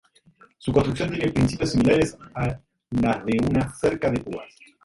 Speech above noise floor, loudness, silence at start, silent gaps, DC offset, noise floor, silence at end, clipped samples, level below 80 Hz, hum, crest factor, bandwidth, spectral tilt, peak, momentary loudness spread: 33 dB; -23 LUFS; 0.6 s; none; under 0.1%; -56 dBFS; 0.4 s; under 0.1%; -42 dBFS; none; 18 dB; 11.5 kHz; -6.5 dB/octave; -6 dBFS; 10 LU